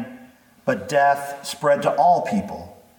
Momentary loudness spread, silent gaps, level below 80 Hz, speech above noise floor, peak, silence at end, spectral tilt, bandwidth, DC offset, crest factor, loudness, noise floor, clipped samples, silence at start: 16 LU; none; -60 dBFS; 29 dB; -6 dBFS; 0.25 s; -5 dB/octave; 19 kHz; under 0.1%; 16 dB; -21 LUFS; -49 dBFS; under 0.1%; 0 s